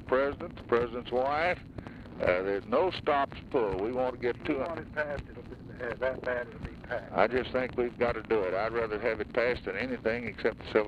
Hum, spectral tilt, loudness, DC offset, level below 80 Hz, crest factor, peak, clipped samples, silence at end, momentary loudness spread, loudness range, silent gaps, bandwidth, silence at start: none; -7 dB/octave; -31 LUFS; under 0.1%; -52 dBFS; 20 dB; -10 dBFS; under 0.1%; 0 s; 11 LU; 3 LU; none; 9 kHz; 0 s